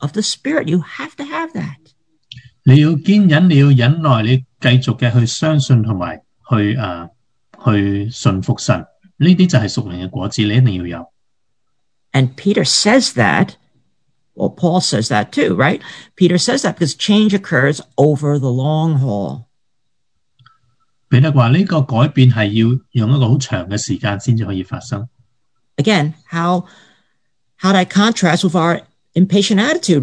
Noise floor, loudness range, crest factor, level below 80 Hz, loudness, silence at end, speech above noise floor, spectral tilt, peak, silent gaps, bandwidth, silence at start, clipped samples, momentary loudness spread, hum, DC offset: -75 dBFS; 6 LU; 14 dB; -52 dBFS; -15 LUFS; 0 s; 61 dB; -6 dB/octave; 0 dBFS; none; 10.5 kHz; 0 s; under 0.1%; 12 LU; none; under 0.1%